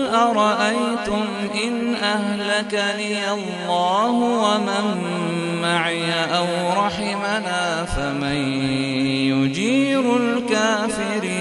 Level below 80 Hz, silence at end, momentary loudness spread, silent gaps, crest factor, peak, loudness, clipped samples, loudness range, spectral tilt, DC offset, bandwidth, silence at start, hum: -44 dBFS; 0 s; 5 LU; none; 16 dB; -4 dBFS; -20 LUFS; under 0.1%; 1 LU; -4.5 dB/octave; under 0.1%; 11.5 kHz; 0 s; none